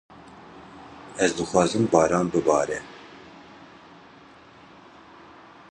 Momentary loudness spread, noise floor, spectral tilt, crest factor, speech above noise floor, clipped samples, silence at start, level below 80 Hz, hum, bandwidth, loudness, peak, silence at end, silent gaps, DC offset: 26 LU; -50 dBFS; -5 dB/octave; 24 dB; 28 dB; under 0.1%; 0.35 s; -56 dBFS; none; 10.5 kHz; -23 LUFS; -2 dBFS; 2.3 s; none; under 0.1%